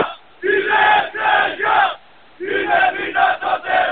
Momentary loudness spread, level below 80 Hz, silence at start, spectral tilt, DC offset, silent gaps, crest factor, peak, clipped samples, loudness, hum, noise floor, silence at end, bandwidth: 10 LU; -56 dBFS; 0 s; -7.5 dB/octave; 0.4%; none; 16 dB; -2 dBFS; under 0.1%; -16 LUFS; none; -39 dBFS; 0 s; 4.6 kHz